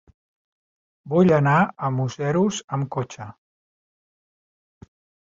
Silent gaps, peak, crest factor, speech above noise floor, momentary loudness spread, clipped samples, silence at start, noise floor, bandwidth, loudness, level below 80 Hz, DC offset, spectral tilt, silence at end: 2.64-2.68 s; -6 dBFS; 18 dB; over 69 dB; 15 LU; under 0.1%; 1.05 s; under -90 dBFS; 7.8 kHz; -21 LUFS; -60 dBFS; under 0.1%; -6.5 dB/octave; 1.9 s